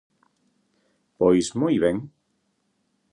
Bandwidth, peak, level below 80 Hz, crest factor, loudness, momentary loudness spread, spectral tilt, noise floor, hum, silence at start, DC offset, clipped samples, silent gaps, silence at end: 11 kHz; -6 dBFS; -56 dBFS; 20 dB; -22 LUFS; 11 LU; -6 dB/octave; -72 dBFS; none; 1.2 s; under 0.1%; under 0.1%; none; 1.05 s